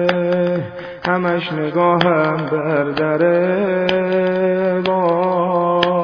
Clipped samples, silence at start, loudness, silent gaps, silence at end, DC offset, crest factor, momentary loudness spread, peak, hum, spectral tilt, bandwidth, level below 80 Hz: under 0.1%; 0 s; -17 LUFS; none; 0 s; under 0.1%; 16 dB; 5 LU; 0 dBFS; none; -8 dB/octave; 5.4 kHz; -54 dBFS